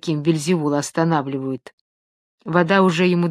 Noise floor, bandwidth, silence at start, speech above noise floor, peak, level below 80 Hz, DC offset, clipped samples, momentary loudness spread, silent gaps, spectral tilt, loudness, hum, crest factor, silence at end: under -90 dBFS; 13.5 kHz; 0.05 s; over 71 dB; 0 dBFS; -64 dBFS; under 0.1%; under 0.1%; 13 LU; 1.73-2.38 s; -6 dB/octave; -19 LUFS; none; 20 dB; 0 s